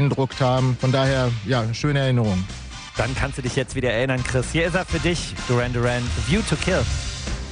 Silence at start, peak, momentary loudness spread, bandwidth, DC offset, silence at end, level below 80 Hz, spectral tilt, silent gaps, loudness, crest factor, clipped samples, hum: 0 s; -8 dBFS; 6 LU; 10 kHz; under 0.1%; 0 s; -34 dBFS; -5.5 dB/octave; none; -22 LUFS; 14 dB; under 0.1%; none